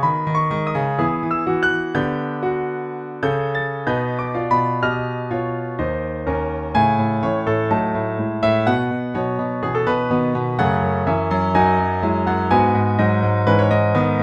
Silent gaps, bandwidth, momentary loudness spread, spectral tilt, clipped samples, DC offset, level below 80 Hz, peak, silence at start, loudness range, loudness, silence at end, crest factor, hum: none; 7 kHz; 7 LU; -8.5 dB/octave; under 0.1%; under 0.1%; -42 dBFS; -4 dBFS; 0 s; 4 LU; -20 LUFS; 0 s; 16 dB; none